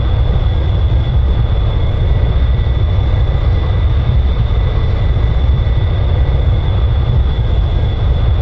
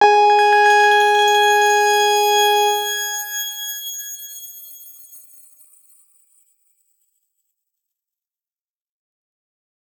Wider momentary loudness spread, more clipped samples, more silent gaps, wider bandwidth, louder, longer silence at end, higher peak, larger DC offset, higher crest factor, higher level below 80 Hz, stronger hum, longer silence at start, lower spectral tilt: second, 1 LU vs 20 LU; neither; neither; second, 5.2 kHz vs over 20 kHz; about the same, -15 LUFS vs -15 LUFS; second, 0 s vs 4.8 s; about the same, 0 dBFS vs -2 dBFS; neither; second, 12 dB vs 18 dB; first, -14 dBFS vs under -90 dBFS; neither; about the same, 0 s vs 0 s; first, -9 dB/octave vs 2 dB/octave